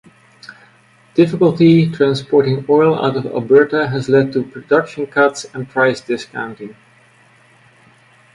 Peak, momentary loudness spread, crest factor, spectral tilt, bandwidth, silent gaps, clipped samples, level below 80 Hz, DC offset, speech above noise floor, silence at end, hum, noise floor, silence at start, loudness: 0 dBFS; 12 LU; 16 dB; -7 dB/octave; 11 kHz; none; under 0.1%; -56 dBFS; under 0.1%; 36 dB; 1.65 s; none; -50 dBFS; 0.5 s; -15 LUFS